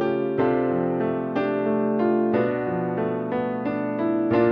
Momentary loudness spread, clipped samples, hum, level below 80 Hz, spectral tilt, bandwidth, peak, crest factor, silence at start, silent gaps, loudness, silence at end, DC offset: 5 LU; under 0.1%; none; -60 dBFS; -10 dB/octave; 5.2 kHz; -8 dBFS; 14 dB; 0 s; none; -24 LUFS; 0 s; under 0.1%